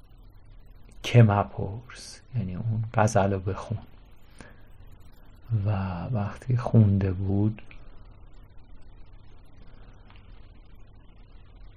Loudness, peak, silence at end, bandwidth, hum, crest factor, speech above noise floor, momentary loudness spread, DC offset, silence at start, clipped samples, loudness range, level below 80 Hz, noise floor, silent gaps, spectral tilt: -26 LUFS; -6 dBFS; 0.1 s; 11 kHz; none; 22 dB; 24 dB; 16 LU; under 0.1%; 0.2 s; under 0.1%; 7 LU; -46 dBFS; -49 dBFS; none; -7.5 dB/octave